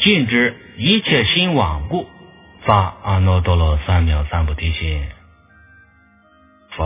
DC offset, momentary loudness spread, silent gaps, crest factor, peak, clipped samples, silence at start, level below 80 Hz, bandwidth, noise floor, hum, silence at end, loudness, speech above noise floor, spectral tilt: under 0.1%; 11 LU; none; 18 dB; 0 dBFS; under 0.1%; 0 s; -24 dBFS; 3.9 kHz; -52 dBFS; none; 0 s; -17 LUFS; 36 dB; -10 dB/octave